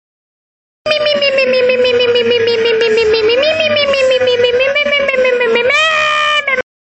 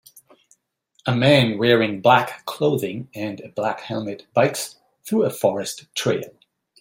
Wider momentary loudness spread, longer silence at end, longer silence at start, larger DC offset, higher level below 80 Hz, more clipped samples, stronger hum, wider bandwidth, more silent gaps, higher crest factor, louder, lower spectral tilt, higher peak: second, 2 LU vs 13 LU; about the same, 0.4 s vs 0.5 s; second, 0.85 s vs 1.05 s; neither; first, -48 dBFS vs -60 dBFS; neither; neither; second, 8.4 kHz vs 16.5 kHz; neither; second, 12 dB vs 20 dB; first, -11 LUFS vs -21 LUFS; second, -2.5 dB/octave vs -5 dB/octave; about the same, 0 dBFS vs -2 dBFS